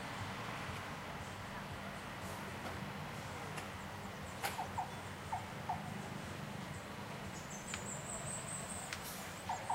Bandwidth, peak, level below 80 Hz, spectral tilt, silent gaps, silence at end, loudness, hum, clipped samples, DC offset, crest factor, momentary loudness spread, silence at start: 16 kHz; -22 dBFS; -62 dBFS; -3.5 dB/octave; none; 0 s; -44 LUFS; none; under 0.1%; under 0.1%; 22 dB; 4 LU; 0 s